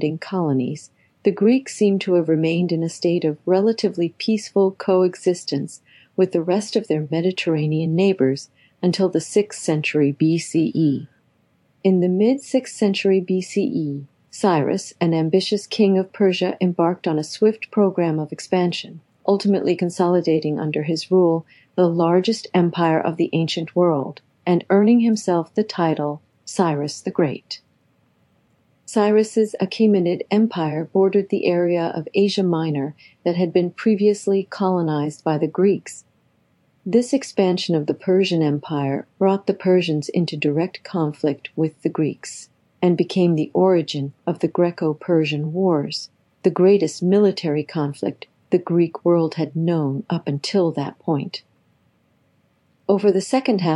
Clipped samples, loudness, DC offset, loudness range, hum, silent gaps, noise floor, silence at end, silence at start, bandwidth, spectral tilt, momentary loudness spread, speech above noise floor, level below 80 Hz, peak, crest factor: under 0.1%; -20 LUFS; under 0.1%; 3 LU; none; none; -62 dBFS; 0 s; 0 s; 11.5 kHz; -6.5 dB/octave; 8 LU; 43 dB; -76 dBFS; -4 dBFS; 16 dB